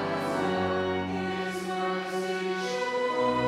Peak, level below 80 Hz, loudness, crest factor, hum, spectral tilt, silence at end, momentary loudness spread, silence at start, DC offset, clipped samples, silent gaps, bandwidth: -14 dBFS; -64 dBFS; -29 LUFS; 14 dB; none; -5 dB/octave; 0 s; 4 LU; 0 s; under 0.1%; under 0.1%; none; 14.5 kHz